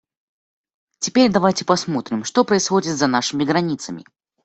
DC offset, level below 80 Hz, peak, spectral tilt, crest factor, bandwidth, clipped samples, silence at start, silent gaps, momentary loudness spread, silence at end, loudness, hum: under 0.1%; -58 dBFS; -2 dBFS; -4 dB/octave; 18 dB; 8.4 kHz; under 0.1%; 1 s; none; 10 LU; 0.45 s; -19 LUFS; none